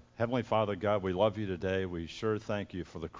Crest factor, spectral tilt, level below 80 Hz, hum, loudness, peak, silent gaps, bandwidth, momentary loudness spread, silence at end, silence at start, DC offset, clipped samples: 18 dB; -7 dB/octave; -54 dBFS; none; -33 LUFS; -14 dBFS; none; 7.6 kHz; 7 LU; 0 s; 0.2 s; under 0.1%; under 0.1%